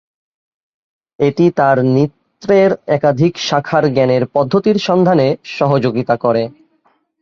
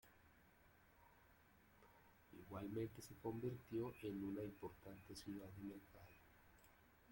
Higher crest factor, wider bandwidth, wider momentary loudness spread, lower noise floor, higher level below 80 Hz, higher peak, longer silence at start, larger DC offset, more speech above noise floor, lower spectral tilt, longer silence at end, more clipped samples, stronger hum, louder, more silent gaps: second, 14 dB vs 20 dB; second, 7.4 kHz vs 16.5 kHz; second, 5 LU vs 21 LU; second, -59 dBFS vs -72 dBFS; first, -54 dBFS vs -76 dBFS; first, 0 dBFS vs -34 dBFS; first, 1.2 s vs 0.05 s; neither; first, 46 dB vs 21 dB; about the same, -7 dB/octave vs -6.5 dB/octave; first, 0.7 s vs 0 s; neither; neither; first, -14 LUFS vs -52 LUFS; neither